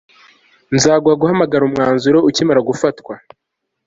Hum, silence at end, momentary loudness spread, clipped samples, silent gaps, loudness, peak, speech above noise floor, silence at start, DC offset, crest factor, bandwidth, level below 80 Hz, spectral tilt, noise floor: none; 0.7 s; 11 LU; under 0.1%; none; -14 LUFS; -2 dBFS; 62 dB; 0.7 s; under 0.1%; 14 dB; 8 kHz; -52 dBFS; -5 dB/octave; -76 dBFS